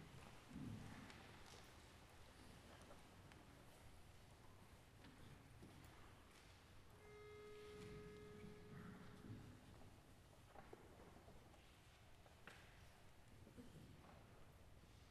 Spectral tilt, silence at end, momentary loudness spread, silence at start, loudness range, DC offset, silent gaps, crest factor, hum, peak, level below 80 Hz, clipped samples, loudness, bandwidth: -5 dB/octave; 0 s; 9 LU; 0 s; 5 LU; under 0.1%; none; 18 dB; none; -44 dBFS; -72 dBFS; under 0.1%; -63 LUFS; 13 kHz